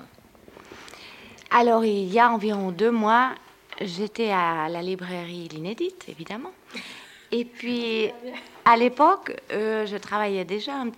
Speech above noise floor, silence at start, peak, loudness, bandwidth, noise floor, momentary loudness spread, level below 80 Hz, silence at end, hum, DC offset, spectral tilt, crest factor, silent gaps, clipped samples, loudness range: 28 dB; 0 s; -4 dBFS; -24 LUFS; 16.5 kHz; -51 dBFS; 21 LU; -68 dBFS; 0.05 s; none; under 0.1%; -5.5 dB/octave; 20 dB; none; under 0.1%; 8 LU